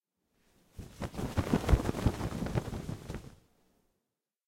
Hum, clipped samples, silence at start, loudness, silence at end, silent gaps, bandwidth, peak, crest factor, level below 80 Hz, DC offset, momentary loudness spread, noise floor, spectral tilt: none; under 0.1%; 0.75 s; -34 LUFS; 1.15 s; none; 16.5 kHz; -12 dBFS; 24 dB; -42 dBFS; under 0.1%; 16 LU; -87 dBFS; -6.5 dB/octave